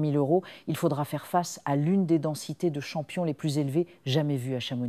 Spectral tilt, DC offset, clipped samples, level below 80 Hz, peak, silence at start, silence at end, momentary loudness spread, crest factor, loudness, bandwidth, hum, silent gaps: -6.5 dB/octave; under 0.1%; under 0.1%; -74 dBFS; -10 dBFS; 0 s; 0 s; 7 LU; 16 dB; -28 LUFS; 15.5 kHz; none; none